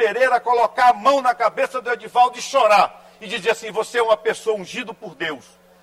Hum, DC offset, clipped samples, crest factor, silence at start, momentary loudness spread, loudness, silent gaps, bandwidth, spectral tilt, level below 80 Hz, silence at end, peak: none; under 0.1%; under 0.1%; 16 dB; 0 s; 13 LU; -19 LUFS; none; 14.5 kHz; -2.5 dB/octave; -64 dBFS; 0.45 s; -4 dBFS